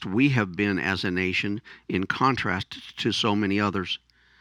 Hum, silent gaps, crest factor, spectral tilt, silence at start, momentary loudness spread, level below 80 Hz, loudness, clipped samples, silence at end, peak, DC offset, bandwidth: none; none; 20 dB; -5.5 dB/octave; 0 s; 9 LU; -58 dBFS; -25 LUFS; under 0.1%; 0.45 s; -6 dBFS; under 0.1%; 11 kHz